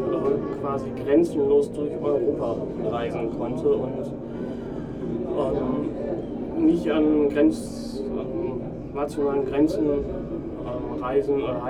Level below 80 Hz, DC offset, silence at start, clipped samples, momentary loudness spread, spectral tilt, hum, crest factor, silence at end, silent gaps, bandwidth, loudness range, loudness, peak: -44 dBFS; under 0.1%; 0 s; under 0.1%; 11 LU; -8 dB/octave; none; 16 dB; 0 s; none; 11.5 kHz; 4 LU; -25 LUFS; -8 dBFS